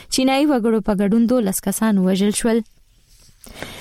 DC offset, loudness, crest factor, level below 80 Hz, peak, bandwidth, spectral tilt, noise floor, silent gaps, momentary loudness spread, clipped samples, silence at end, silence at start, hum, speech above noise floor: under 0.1%; -18 LUFS; 12 dB; -44 dBFS; -8 dBFS; 16 kHz; -5 dB/octave; -52 dBFS; none; 9 LU; under 0.1%; 0 s; 0 s; none; 34 dB